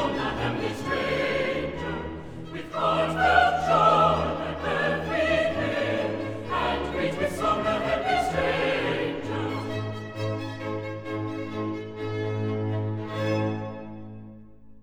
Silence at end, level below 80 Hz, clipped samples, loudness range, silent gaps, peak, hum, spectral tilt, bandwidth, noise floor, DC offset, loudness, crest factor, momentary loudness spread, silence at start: 0.1 s; -48 dBFS; under 0.1%; 8 LU; none; -6 dBFS; none; -6 dB/octave; 15.5 kHz; -49 dBFS; 0.3%; -26 LUFS; 20 dB; 13 LU; 0 s